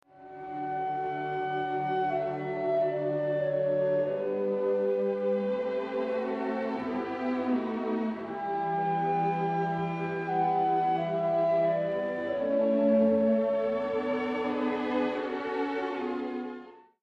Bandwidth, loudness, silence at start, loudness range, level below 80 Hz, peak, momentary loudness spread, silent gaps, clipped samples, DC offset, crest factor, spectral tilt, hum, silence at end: 6.8 kHz; -29 LUFS; 0.15 s; 4 LU; -70 dBFS; -14 dBFS; 7 LU; none; under 0.1%; under 0.1%; 16 dB; -8.5 dB/octave; none; 0.25 s